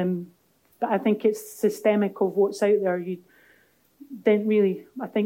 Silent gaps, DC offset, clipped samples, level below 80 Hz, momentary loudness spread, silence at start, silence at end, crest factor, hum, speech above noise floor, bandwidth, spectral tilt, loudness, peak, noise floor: none; under 0.1%; under 0.1%; -80 dBFS; 12 LU; 0 s; 0 s; 16 dB; none; 38 dB; 17 kHz; -6.5 dB/octave; -24 LUFS; -8 dBFS; -61 dBFS